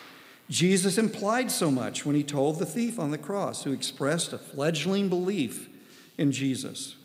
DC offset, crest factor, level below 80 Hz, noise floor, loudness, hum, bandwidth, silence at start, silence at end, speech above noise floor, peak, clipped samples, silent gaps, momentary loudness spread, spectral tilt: under 0.1%; 16 dB; -84 dBFS; -50 dBFS; -28 LUFS; none; 16 kHz; 0 s; 0.1 s; 22 dB; -12 dBFS; under 0.1%; none; 9 LU; -4.5 dB/octave